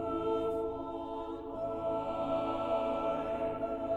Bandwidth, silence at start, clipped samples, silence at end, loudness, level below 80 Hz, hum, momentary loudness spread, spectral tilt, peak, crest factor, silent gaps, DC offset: 8.4 kHz; 0 s; under 0.1%; 0 s; -35 LUFS; -56 dBFS; none; 7 LU; -7.5 dB/octave; -22 dBFS; 14 dB; none; under 0.1%